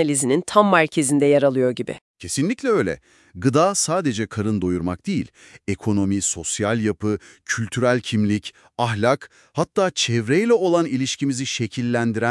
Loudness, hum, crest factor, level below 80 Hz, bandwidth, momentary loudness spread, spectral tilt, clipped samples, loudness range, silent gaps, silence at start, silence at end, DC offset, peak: -21 LUFS; none; 20 dB; -58 dBFS; 12 kHz; 10 LU; -4.5 dB/octave; under 0.1%; 3 LU; 2.01-2.14 s; 0 s; 0 s; under 0.1%; 0 dBFS